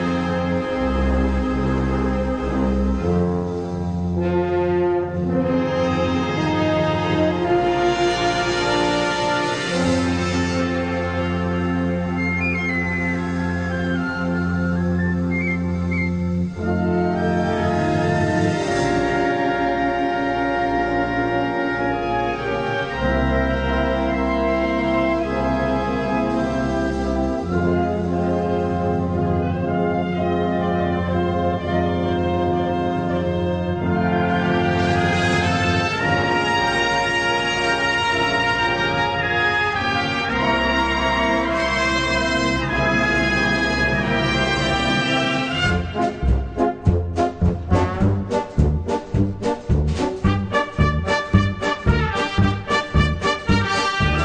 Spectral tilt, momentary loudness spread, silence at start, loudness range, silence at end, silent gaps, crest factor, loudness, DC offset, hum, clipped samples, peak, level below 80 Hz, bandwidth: -6 dB/octave; 4 LU; 0 s; 3 LU; 0 s; none; 18 dB; -20 LUFS; under 0.1%; none; under 0.1%; -2 dBFS; -32 dBFS; 9.8 kHz